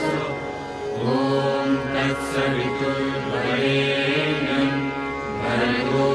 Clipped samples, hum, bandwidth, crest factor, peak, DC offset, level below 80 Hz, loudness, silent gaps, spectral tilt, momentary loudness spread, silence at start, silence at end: under 0.1%; none; 11 kHz; 14 dB; -8 dBFS; under 0.1%; -48 dBFS; -23 LUFS; none; -6 dB/octave; 7 LU; 0 s; 0 s